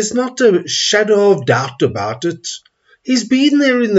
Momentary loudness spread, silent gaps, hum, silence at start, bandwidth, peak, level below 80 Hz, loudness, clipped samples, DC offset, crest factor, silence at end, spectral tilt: 12 LU; none; none; 0 s; 8 kHz; 0 dBFS; -60 dBFS; -14 LUFS; under 0.1%; under 0.1%; 14 dB; 0 s; -4 dB/octave